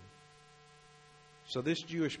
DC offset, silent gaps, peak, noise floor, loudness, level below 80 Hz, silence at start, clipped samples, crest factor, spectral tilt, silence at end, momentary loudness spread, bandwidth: under 0.1%; none; -22 dBFS; -60 dBFS; -36 LUFS; -74 dBFS; 0 s; under 0.1%; 18 dB; -5 dB/octave; 0 s; 24 LU; 10.5 kHz